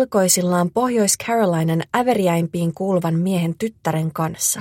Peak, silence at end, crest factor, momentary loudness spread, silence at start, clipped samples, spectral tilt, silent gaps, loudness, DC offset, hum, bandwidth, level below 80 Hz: -2 dBFS; 0 s; 16 dB; 7 LU; 0 s; under 0.1%; -5 dB/octave; none; -19 LUFS; under 0.1%; none; 16.5 kHz; -58 dBFS